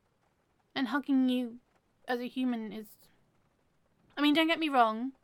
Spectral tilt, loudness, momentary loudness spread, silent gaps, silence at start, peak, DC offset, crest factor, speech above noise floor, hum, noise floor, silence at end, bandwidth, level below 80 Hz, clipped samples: -4.5 dB/octave; -30 LUFS; 16 LU; none; 0.75 s; -12 dBFS; under 0.1%; 20 dB; 43 dB; none; -73 dBFS; 0.15 s; 17 kHz; -78 dBFS; under 0.1%